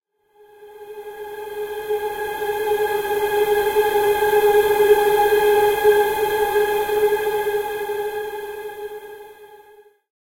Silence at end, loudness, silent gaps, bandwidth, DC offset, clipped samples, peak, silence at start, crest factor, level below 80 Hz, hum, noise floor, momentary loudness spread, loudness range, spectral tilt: 0.65 s; -19 LUFS; none; 16 kHz; under 0.1%; under 0.1%; -4 dBFS; 0.6 s; 16 dB; -50 dBFS; none; -54 dBFS; 18 LU; 8 LU; -3 dB/octave